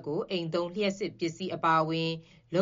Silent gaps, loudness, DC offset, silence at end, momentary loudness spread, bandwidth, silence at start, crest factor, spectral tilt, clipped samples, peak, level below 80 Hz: none; -30 LUFS; under 0.1%; 0 s; 8 LU; 7.4 kHz; 0 s; 18 dB; -4 dB/octave; under 0.1%; -14 dBFS; -68 dBFS